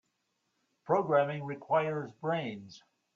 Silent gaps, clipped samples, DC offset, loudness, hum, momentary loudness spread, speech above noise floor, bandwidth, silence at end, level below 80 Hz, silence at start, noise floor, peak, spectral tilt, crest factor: none; under 0.1%; under 0.1%; -32 LUFS; none; 12 LU; 48 dB; 7.2 kHz; 0.35 s; -78 dBFS; 0.85 s; -80 dBFS; -14 dBFS; -7.5 dB/octave; 20 dB